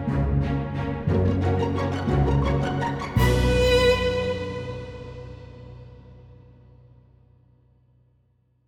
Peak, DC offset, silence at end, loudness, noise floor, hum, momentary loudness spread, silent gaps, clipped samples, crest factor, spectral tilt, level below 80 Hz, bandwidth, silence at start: -8 dBFS; under 0.1%; 2.35 s; -23 LUFS; -65 dBFS; none; 21 LU; none; under 0.1%; 18 dB; -6.5 dB/octave; -34 dBFS; 16.5 kHz; 0 s